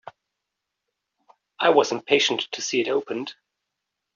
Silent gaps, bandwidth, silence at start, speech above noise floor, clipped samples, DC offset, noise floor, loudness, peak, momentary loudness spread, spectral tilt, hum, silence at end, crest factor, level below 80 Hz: none; 7.4 kHz; 0.05 s; 60 dB; under 0.1%; under 0.1%; -83 dBFS; -22 LUFS; -4 dBFS; 13 LU; -1 dB/octave; none; 0.85 s; 22 dB; -74 dBFS